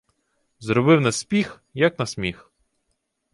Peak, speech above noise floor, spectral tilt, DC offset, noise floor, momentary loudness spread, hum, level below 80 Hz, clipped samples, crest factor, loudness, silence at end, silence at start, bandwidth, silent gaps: -4 dBFS; 53 dB; -5.5 dB/octave; under 0.1%; -74 dBFS; 12 LU; none; -54 dBFS; under 0.1%; 20 dB; -21 LUFS; 1 s; 0.6 s; 11.5 kHz; none